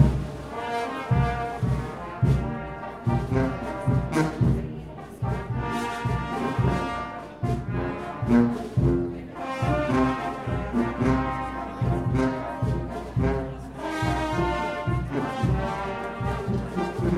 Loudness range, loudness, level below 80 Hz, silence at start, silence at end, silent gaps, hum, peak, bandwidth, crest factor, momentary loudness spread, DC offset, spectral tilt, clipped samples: 2 LU; -27 LUFS; -36 dBFS; 0 s; 0 s; none; none; -6 dBFS; 12.5 kHz; 20 dB; 8 LU; under 0.1%; -7.5 dB/octave; under 0.1%